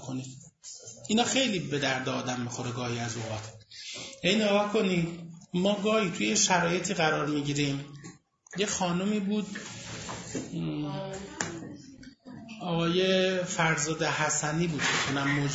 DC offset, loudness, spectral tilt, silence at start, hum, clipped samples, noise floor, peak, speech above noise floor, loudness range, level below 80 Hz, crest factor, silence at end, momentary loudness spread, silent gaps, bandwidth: under 0.1%; -29 LUFS; -4 dB/octave; 0 s; none; under 0.1%; -50 dBFS; -8 dBFS; 22 dB; 6 LU; -60 dBFS; 20 dB; 0 s; 18 LU; none; 8 kHz